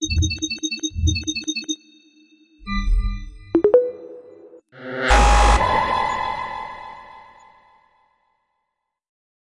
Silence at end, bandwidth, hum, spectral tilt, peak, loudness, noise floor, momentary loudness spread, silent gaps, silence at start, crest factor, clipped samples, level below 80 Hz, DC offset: 2.25 s; 11.5 kHz; none; -4 dB/octave; -2 dBFS; -21 LUFS; -78 dBFS; 23 LU; none; 0 s; 20 dB; under 0.1%; -26 dBFS; under 0.1%